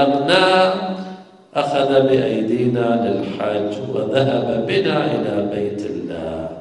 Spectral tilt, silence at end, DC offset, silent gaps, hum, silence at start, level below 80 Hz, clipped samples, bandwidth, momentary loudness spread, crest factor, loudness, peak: -6.5 dB/octave; 0 s; under 0.1%; none; none; 0 s; -54 dBFS; under 0.1%; 10.5 kHz; 12 LU; 18 dB; -18 LUFS; 0 dBFS